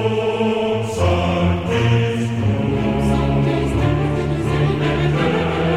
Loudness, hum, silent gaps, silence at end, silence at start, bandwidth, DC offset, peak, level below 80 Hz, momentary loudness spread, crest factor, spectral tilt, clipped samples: -18 LUFS; none; none; 0 s; 0 s; 12 kHz; 0.5%; -4 dBFS; -30 dBFS; 3 LU; 12 dB; -7 dB/octave; under 0.1%